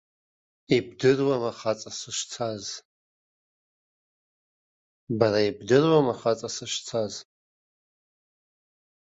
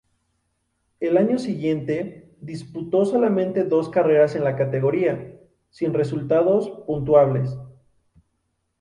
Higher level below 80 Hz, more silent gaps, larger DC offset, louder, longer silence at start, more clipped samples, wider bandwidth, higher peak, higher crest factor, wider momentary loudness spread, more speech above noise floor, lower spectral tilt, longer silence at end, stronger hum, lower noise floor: second, -66 dBFS vs -56 dBFS; first, 2.85-5.07 s vs none; neither; second, -26 LUFS vs -21 LUFS; second, 0.7 s vs 1 s; neither; second, 8.2 kHz vs 10.5 kHz; about the same, -6 dBFS vs -4 dBFS; first, 24 dB vs 18 dB; second, 12 LU vs 15 LU; first, over 65 dB vs 53 dB; second, -5 dB/octave vs -8.5 dB/octave; first, 1.95 s vs 1.1 s; neither; first, under -90 dBFS vs -73 dBFS